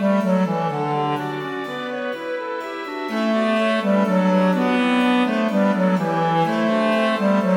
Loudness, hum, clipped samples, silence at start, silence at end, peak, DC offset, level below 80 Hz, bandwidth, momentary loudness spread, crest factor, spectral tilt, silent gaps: -20 LUFS; none; under 0.1%; 0 s; 0 s; -6 dBFS; under 0.1%; -72 dBFS; 13 kHz; 9 LU; 12 dB; -7 dB/octave; none